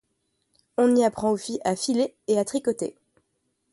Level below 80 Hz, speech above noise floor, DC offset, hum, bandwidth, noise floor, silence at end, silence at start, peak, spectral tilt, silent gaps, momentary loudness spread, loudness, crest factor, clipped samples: -64 dBFS; 51 dB; under 0.1%; none; 11.5 kHz; -74 dBFS; 0.8 s; 0.8 s; -10 dBFS; -4.5 dB/octave; none; 10 LU; -25 LUFS; 16 dB; under 0.1%